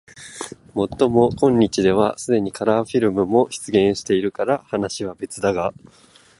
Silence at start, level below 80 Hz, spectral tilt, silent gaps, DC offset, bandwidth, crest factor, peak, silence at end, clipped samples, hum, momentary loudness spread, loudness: 0.15 s; -50 dBFS; -5.5 dB/octave; none; under 0.1%; 11.5 kHz; 18 dB; -2 dBFS; 0.7 s; under 0.1%; none; 11 LU; -20 LUFS